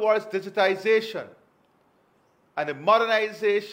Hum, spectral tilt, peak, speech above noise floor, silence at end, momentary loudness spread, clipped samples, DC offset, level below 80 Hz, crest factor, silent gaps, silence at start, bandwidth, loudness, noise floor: none; -4.5 dB/octave; -8 dBFS; 40 dB; 0 s; 15 LU; under 0.1%; under 0.1%; -78 dBFS; 18 dB; none; 0 s; 16 kHz; -24 LUFS; -64 dBFS